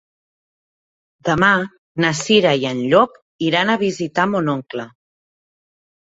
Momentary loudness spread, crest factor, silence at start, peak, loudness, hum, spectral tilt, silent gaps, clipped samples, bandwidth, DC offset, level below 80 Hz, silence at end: 12 LU; 18 dB; 1.25 s; 0 dBFS; -17 LUFS; none; -4.5 dB/octave; 1.78-1.95 s, 3.22-3.39 s; under 0.1%; 8 kHz; under 0.1%; -54 dBFS; 1.25 s